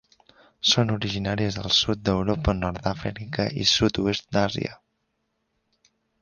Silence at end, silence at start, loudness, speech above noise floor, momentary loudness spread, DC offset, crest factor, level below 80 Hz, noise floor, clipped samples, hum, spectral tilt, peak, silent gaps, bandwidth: 1.45 s; 0.65 s; -24 LUFS; 51 dB; 9 LU; under 0.1%; 20 dB; -42 dBFS; -75 dBFS; under 0.1%; none; -4.5 dB/octave; -6 dBFS; none; 10 kHz